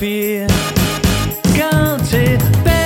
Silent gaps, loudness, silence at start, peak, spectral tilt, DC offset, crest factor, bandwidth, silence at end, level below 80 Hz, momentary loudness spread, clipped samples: none; -15 LUFS; 0 s; 0 dBFS; -5.5 dB/octave; under 0.1%; 14 dB; 16.5 kHz; 0 s; -24 dBFS; 3 LU; under 0.1%